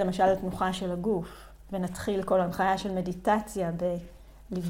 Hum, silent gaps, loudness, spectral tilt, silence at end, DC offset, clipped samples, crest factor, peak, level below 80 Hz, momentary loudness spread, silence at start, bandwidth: none; none; -29 LUFS; -6 dB/octave; 0 s; under 0.1%; under 0.1%; 18 dB; -12 dBFS; -50 dBFS; 9 LU; 0 s; 16.5 kHz